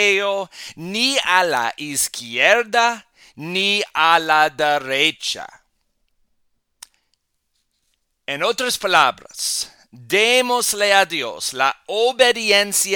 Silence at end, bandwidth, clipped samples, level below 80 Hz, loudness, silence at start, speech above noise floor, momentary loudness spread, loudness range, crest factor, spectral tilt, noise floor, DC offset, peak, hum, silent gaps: 0 s; 19 kHz; under 0.1%; -62 dBFS; -17 LUFS; 0 s; 52 dB; 11 LU; 9 LU; 20 dB; -1 dB/octave; -71 dBFS; under 0.1%; 0 dBFS; none; none